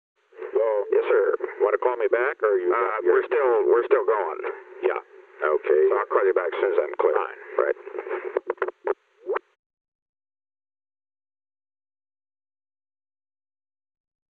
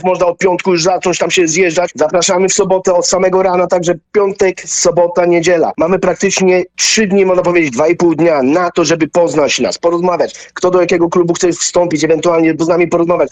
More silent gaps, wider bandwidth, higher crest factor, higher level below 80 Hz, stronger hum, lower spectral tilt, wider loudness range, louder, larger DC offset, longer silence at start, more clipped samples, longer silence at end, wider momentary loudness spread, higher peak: neither; second, 4 kHz vs 9.4 kHz; first, 18 dB vs 10 dB; second, -84 dBFS vs -46 dBFS; neither; first, -6 dB/octave vs -4 dB/octave; first, 12 LU vs 1 LU; second, -24 LUFS vs -11 LUFS; neither; first, 0.4 s vs 0 s; neither; first, 5 s vs 0.05 s; first, 11 LU vs 3 LU; second, -6 dBFS vs 0 dBFS